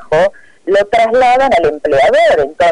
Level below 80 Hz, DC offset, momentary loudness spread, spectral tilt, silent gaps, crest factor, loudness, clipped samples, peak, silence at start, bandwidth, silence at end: -40 dBFS; under 0.1%; 6 LU; -4.5 dB/octave; none; 6 dB; -11 LUFS; under 0.1%; -6 dBFS; 0 s; 11 kHz; 0 s